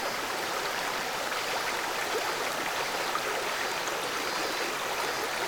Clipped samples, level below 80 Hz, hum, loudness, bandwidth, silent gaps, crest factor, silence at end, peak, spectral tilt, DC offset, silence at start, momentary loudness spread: under 0.1%; -62 dBFS; none; -30 LUFS; over 20 kHz; none; 16 dB; 0 s; -16 dBFS; -1 dB/octave; under 0.1%; 0 s; 1 LU